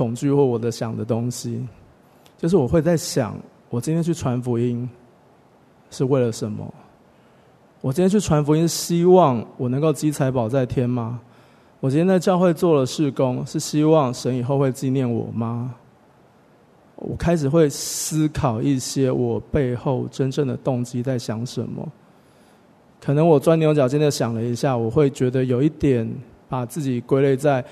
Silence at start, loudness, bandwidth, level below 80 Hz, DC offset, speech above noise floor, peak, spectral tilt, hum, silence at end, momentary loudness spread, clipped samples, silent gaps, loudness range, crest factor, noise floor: 0 s; -21 LUFS; 13.5 kHz; -48 dBFS; under 0.1%; 34 dB; -2 dBFS; -6.5 dB/octave; none; 0 s; 12 LU; under 0.1%; none; 6 LU; 18 dB; -53 dBFS